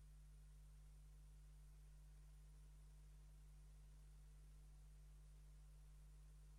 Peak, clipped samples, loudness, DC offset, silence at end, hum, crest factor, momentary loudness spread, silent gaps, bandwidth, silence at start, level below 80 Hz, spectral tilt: -56 dBFS; under 0.1%; -67 LUFS; under 0.1%; 0 s; 50 Hz at -65 dBFS; 6 dB; 0 LU; none; 12.5 kHz; 0 s; -64 dBFS; -5.5 dB/octave